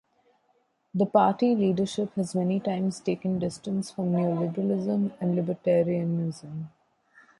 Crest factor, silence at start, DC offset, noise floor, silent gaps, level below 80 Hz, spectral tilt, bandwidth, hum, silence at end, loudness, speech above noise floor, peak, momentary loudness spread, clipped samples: 20 dB; 0.95 s; under 0.1%; -70 dBFS; none; -66 dBFS; -7.5 dB/octave; 11.5 kHz; none; 0.7 s; -27 LUFS; 44 dB; -8 dBFS; 9 LU; under 0.1%